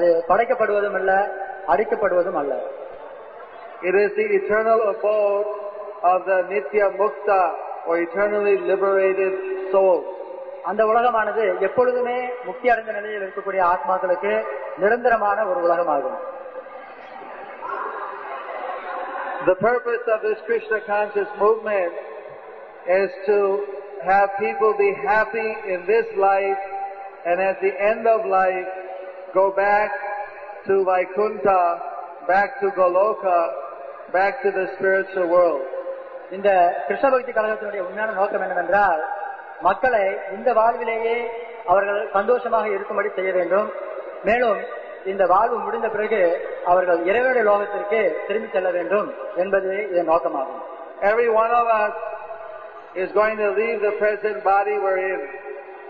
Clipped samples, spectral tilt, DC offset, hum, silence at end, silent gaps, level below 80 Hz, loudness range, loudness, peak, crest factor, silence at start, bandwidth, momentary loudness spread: under 0.1%; -7.5 dB/octave; 0.1%; none; 0 s; none; -60 dBFS; 3 LU; -21 LUFS; -6 dBFS; 16 dB; 0 s; 5 kHz; 14 LU